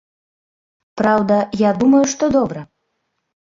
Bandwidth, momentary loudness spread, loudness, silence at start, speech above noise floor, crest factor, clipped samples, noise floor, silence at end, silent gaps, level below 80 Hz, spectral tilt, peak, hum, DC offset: 7.6 kHz; 8 LU; -16 LUFS; 0.95 s; 57 dB; 14 dB; under 0.1%; -72 dBFS; 0.9 s; none; -52 dBFS; -5.5 dB/octave; -4 dBFS; none; under 0.1%